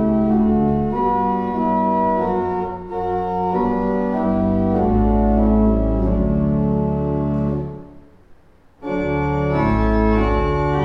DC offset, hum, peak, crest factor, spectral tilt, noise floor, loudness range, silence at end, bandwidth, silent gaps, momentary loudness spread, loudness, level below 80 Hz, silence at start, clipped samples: under 0.1%; none; -4 dBFS; 14 dB; -10 dB/octave; -48 dBFS; 4 LU; 0 s; 5.8 kHz; none; 7 LU; -19 LUFS; -26 dBFS; 0 s; under 0.1%